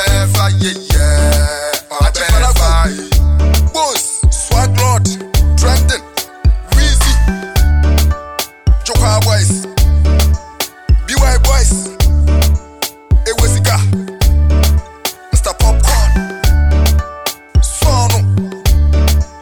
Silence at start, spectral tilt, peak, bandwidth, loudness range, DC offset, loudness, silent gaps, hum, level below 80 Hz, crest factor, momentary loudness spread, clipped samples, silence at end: 0 s; -4.5 dB/octave; 0 dBFS; 19.5 kHz; 1 LU; 2%; -13 LUFS; none; none; -12 dBFS; 10 dB; 5 LU; under 0.1%; 0 s